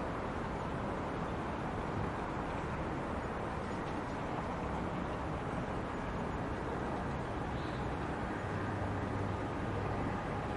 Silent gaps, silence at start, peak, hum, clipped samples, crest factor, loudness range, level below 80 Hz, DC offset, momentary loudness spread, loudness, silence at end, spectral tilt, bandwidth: none; 0 s; -24 dBFS; none; under 0.1%; 14 dB; 1 LU; -48 dBFS; under 0.1%; 2 LU; -38 LUFS; 0 s; -7 dB/octave; 11.5 kHz